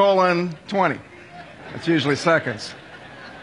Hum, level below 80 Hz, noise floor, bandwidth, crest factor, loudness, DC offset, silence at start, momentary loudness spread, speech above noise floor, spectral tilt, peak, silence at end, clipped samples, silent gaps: none; -62 dBFS; -41 dBFS; 11.5 kHz; 18 dB; -21 LUFS; under 0.1%; 0 s; 22 LU; 21 dB; -5.5 dB/octave; -4 dBFS; 0 s; under 0.1%; none